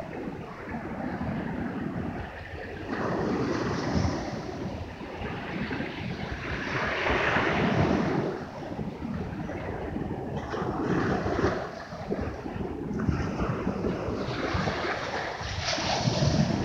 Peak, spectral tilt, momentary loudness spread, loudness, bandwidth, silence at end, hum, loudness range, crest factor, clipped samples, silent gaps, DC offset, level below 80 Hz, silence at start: -10 dBFS; -6 dB/octave; 11 LU; -30 LUFS; 9.8 kHz; 0 s; none; 4 LU; 20 dB; under 0.1%; none; under 0.1%; -44 dBFS; 0 s